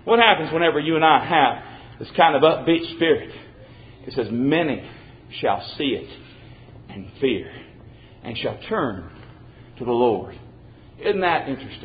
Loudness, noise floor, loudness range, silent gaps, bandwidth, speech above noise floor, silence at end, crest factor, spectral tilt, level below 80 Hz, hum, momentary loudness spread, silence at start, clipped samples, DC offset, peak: -21 LUFS; -45 dBFS; 10 LU; none; 5 kHz; 25 dB; 0 s; 22 dB; -10 dB/octave; -52 dBFS; none; 23 LU; 0.05 s; under 0.1%; under 0.1%; 0 dBFS